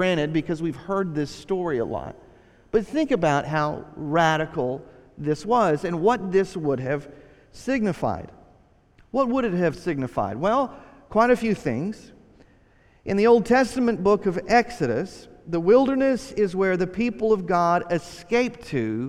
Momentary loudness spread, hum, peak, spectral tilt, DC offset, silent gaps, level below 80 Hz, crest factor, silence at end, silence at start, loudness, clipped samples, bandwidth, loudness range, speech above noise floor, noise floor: 10 LU; none; -6 dBFS; -6.5 dB/octave; under 0.1%; none; -50 dBFS; 18 dB; 0 s; 0 s; -23 LUFS; under 0.1%; 12.5 kHz; 5 LU; 34 dB; -57 dBFS